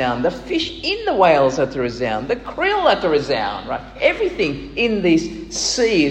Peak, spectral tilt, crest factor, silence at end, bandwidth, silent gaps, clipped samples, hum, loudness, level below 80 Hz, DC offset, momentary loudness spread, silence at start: -2 dBFS; -4 dB/octave; 18 dB; 0 s; 9.6 kHz; none; under 0.1%; none; -19 LUFS; -42 dBFS; under 0.1%; 7 LU; 0 s